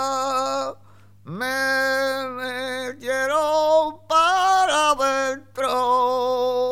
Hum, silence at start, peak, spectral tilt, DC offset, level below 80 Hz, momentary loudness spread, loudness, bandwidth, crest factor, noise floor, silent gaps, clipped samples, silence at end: 50 Hz at -55 dBFS; 0 s; -6 dBFS; -2 dB/octave; 0.3%; -60 dBFS; 10 LU; -21 LUFS; 16.5 kHz; 16 dB; -51 dBFS; none; under 0.1%; 0 s